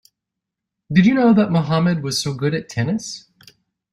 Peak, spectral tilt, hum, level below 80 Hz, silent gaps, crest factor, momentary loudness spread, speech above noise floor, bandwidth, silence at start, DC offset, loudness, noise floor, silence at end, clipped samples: -2 dBFS; -6 dB/octave; none; -54 dBFS; none; 18 dB; 11 LU; 65 dB; 13 kHz; 0.9 s; under 0.1%; -18 LUFS; -83 dBFS; 0.75 s; under 0.1%